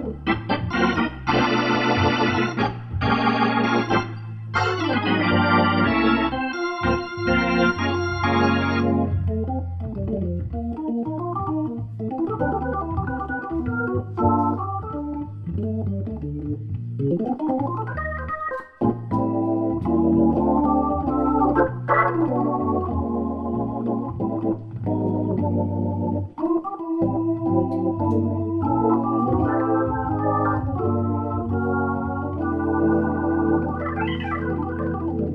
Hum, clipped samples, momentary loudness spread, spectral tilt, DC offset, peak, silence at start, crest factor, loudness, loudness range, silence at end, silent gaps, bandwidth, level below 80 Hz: none; under 0.1%; 8 LU; -8 dB/octave; under 0.1%; -6 dBFS; 0 s; 16 dB; -23 LUFS; 6 LU; 0 s; none; 6.2 kHz; -40 dBFS